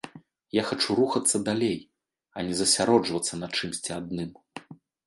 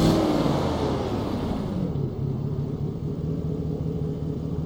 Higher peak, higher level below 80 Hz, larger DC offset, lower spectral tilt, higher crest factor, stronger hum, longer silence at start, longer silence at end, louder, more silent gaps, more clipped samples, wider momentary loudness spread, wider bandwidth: about the same, -6 dBFS vs -8 dBFS; second, -62 dBFS vs -38 dBFS; neither; second, -3 dB/octave vs -7.5 dB/octave; about the same, 22 dB vs 18 dB; neither; about the same, 0.05 s vs 0 s; first, 0.3 s vs 0 s; about the same, -26 LUFS vs -27 LUFS; neither; neither; first, 20 LU vs 7 LU; second, 12 kHz vs over 20 kHz